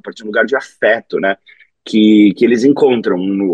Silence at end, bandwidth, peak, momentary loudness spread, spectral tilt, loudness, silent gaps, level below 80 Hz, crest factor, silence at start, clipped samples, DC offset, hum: 0 s; 9 kHz; 0 dBFS; 9 LU; -6.5 dB/octave; -13 LUFS; none; -62 dBFS; 12 dB; 0.05 s; under 0.1%; under 0.1%; none